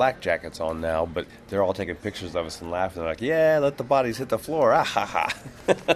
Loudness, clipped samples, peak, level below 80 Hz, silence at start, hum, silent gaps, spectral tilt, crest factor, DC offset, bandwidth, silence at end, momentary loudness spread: -25 LUFS; under 0.1%; -4 dBFS; -50 dBFS; 0 s; none; none; -5 dB/octave; 20 dB; under 0.1%; 14 kHz; 0 s; 10 LU